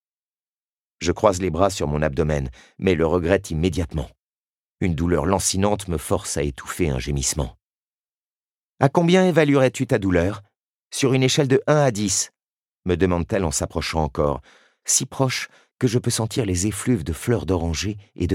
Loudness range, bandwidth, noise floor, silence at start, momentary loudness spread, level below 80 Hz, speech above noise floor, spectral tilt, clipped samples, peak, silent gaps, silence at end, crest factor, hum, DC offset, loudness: 4 LU; 16.5 kHz; under -90 dBFS; 1 s; 10 LU; -38 dBFS; over 69 dB; -5 dB/octave; under 0.1%; 0 dBFS; 4.20-4.75 s, 7.63-8.04 s, 8.11-8.78 s, 10.56-10.77 s, 10.85-10.90 s, 12.46-12.66 s, 12.72-12.76 s, 15.73-15.77 s; 0 s; 22 dB; none; under 0.1%; -21 LUFS